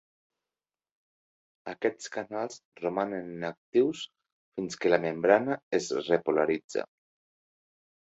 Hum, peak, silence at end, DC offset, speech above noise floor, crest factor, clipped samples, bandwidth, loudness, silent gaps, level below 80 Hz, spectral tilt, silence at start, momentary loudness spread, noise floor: none; -8 dBFS; 1.35 s; under 0.1%; over 61 dB; 24 dB; under 0.1%; 8.2 kHz; -29 LUFS; 2.65-2.72 s, 3.57-3.73 s, 4.32-4.52 s, 5.63-5.71 s, 6.64-6.69 s; -74 dBFS; -5 dB/octave; 1.65 s; 15 LU; under -90 dBFS